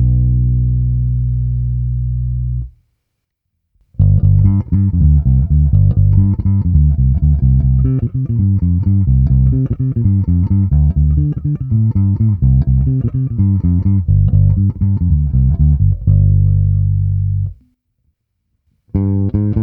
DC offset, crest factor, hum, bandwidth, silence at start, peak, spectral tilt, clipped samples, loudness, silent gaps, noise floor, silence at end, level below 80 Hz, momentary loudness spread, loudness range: under 0.1%; 12 dB; none; 1.4 kHz; 0 s; 0 dBFS; -14.5 dB/octave; under 0.1%; -14 LUFS; none; -72 dBFS; 0 s; -18 dBFS; 6 LU; 5 LU